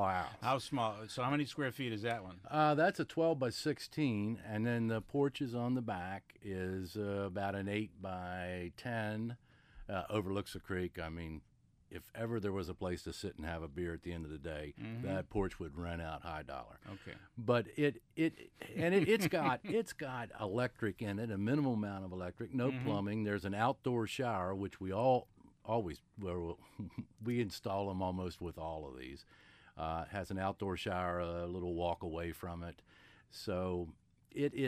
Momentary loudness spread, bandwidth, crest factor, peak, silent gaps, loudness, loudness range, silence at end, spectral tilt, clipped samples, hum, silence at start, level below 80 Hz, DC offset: 12 LU; 15.5 kHz; 20 dB; -18 dBFS; none; -39 LUFS; 7 LU; 0 s; -6.5 dB/octave; under 0.1%; none; 0 s; -60 dBFS; under 0.1%